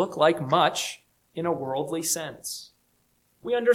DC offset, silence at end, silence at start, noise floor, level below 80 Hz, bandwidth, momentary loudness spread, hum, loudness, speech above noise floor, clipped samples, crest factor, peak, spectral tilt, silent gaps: under 0.1%; 0 s; 0 s; -68 dBFS; -70 dBFS; 17 kHz; 16 LU; none; -26 LUFS; 43 dB; under 0.1%; 20 dB; -6 dBFS; -3.5 dB/octave; none